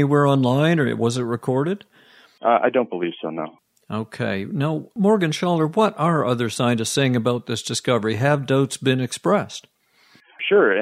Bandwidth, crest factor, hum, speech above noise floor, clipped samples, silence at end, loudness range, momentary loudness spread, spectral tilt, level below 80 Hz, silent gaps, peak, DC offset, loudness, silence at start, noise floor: 15 kHz; 18 dB; none; 36 dB; under 0.1%; 0 s; 4 LU; 11 LU; -5.5 dB/octave; -64 dBFS; none; -4 dBFS; under 0.1%; -21 LUFS; 0 s; -56 dBFS